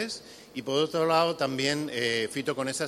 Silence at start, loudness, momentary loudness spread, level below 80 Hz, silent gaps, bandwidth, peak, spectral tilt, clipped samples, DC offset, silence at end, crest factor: 0 s; -27 LUFS; 12 LU; -70 dBFS; none; 15.5 kHz; -10 dBFS; -3.5 dB/octave; under 0.1%; under 0.1%; 0 s; 20 dB